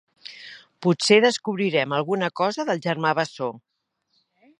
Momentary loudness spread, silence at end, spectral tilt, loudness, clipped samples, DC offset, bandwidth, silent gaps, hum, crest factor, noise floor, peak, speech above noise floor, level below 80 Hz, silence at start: 22 LU; 1 s; -4.5 dB/octave; -22 LUFS; under 0.1%; under 0.1%; 10.5 kHz; none; none; 22 dB; -72 dBFS; -2 dBFS; 50 dB; -76 dBFS; 0.3 s